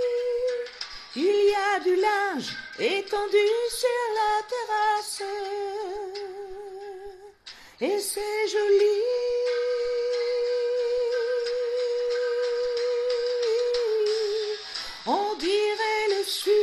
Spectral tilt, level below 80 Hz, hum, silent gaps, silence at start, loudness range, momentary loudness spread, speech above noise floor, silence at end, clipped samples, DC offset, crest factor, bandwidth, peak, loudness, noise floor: -2 dB/octave; -62 dBFS; none; none; 0 s; 6 LU; 13 LU; 23 dB; 0 s; under 0.1%; under 0.1%; 14 dB; 13.5 kHz; -12 dBFS; -26 LUFS; -47 dBFS